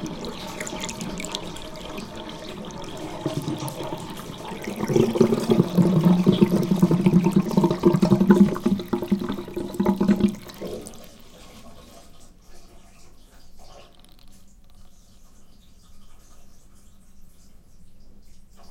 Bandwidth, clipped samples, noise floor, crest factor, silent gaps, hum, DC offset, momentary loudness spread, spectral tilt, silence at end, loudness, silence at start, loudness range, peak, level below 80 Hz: 16.5 kHz; under 0.1%; -47 dBFS; 22 dB; none; none; under 0.1%; 17 LU; -7 dB/octave; 0.05 s; -22 LUFS; 0 s; 14 LU; -2 dBFS; -48 dBFS